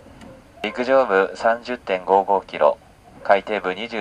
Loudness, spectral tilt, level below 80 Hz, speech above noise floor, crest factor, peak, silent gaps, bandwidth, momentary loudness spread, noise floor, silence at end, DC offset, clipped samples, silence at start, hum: -20 LUFS; -5 dB/octave; -56 dBFS; 24 dB; 20 dB; 0 dBFS; none; 10 kHz; 11 LU; -43 dBFS; 0 s; under 0.1%; under 0.1%; 0.2 s; none